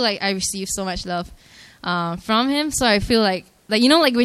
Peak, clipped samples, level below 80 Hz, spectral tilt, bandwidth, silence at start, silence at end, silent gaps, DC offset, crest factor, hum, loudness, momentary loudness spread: -2 dBFS; under 0.1%; -42 dBFS; -3.5 dB/octave; 14.5 kHz; 0 s; 0 s; none; under 0.1%; 18 dB; none; -20 LUFS; 13 LU